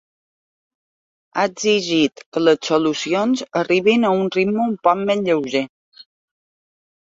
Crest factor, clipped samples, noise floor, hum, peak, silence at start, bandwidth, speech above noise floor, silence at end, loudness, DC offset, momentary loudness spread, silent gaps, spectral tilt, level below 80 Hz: 18 dB; under 0.1%; under -90 dBFS; none; -2 dBFS; 1.35 s; 7.8 kHz; over 72 dB; 1.05 s; -18 LUFS; under 0.1%; 6 LU; 2.26-2.32 s, 5.69-5.92 s; -4.5 dB/octave; -64 dBFS